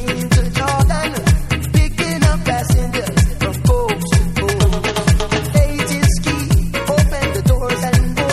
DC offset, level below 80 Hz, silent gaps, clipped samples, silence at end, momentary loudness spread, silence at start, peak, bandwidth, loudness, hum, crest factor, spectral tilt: under 0.1%; -20 dBFS; none; under 0.1%; 0 s; 2 LU; 0 s; 0 dBFS; 15 kHz; -16 LUFS; none; 14 dB; -5.5 dB/octave